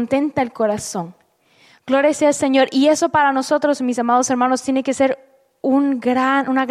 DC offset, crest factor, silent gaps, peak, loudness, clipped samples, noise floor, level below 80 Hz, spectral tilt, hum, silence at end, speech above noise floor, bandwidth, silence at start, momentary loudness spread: under 0.1%; 14 dB; none; -4 dBFS; -17 LUFS; under 0.1%; -55 dBFS; -60 dBFS; -4 dB/octave; none; 0 s; 38 dB; 13.5 kHz; 0 s; 7 LU